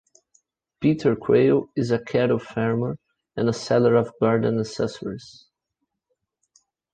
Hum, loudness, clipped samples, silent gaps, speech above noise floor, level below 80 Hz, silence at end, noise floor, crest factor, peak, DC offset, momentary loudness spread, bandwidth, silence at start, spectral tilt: none; -22 LUFS; under 0.1%; none; 58 dB; -58 dBFS; 1.6 s; -80 dBFS; 18 dB; -6 dBFS; under 0.1%; 13 LU; 9.2 kHz; 0.8 s; -7 dB/octave